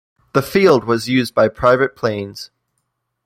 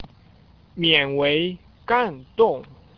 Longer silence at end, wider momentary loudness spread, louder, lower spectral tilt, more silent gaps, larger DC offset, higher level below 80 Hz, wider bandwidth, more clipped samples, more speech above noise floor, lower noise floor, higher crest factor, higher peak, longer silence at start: first, 0.8 s vs 0.35 s; about the same, 15 LU vs 14 LU; first, -16 LUFS vs -21 LUFS; about the same, -6 dB/octave vs -7 dB/octave; neither; neither; first, -48 dBFS vs -54 dBFS; first, 16 kHz vs 5.4 kHz; neither; first, 57 dB vs 31 dB; first, -72 dBFS vs -52 dBFS; about the same, 16 dB vs 20 dB; about the same, -2 dBFS vs -4 dBFS; first, 0.35 s vs 0 s